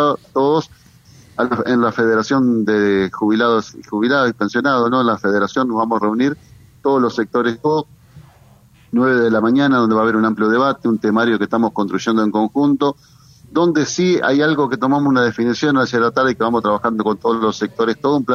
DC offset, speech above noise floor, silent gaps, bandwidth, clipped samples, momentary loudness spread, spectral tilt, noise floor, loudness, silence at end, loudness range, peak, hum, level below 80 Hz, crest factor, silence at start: under 0.1%; 32 dB; none; 7.2 kHz; under 0.1%; 5 LU; -6 dB/octave; -48 dBFS; -16 LUFS; 0 s; 2 LU; -2 dBFS; none; -56 dBFS; 14 dB; 0 s